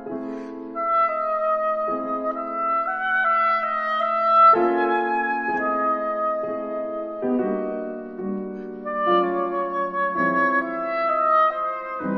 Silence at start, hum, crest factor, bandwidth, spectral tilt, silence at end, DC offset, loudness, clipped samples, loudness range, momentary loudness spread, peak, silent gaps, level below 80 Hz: 0 s; none; 16 dB; 6 kHz; -7.5 dB/octave; 0 s; under 0.1%; -22 LUFS; under 0.1%; 6 LU; 11 LU; -6 dBFS; none; -64 dBFS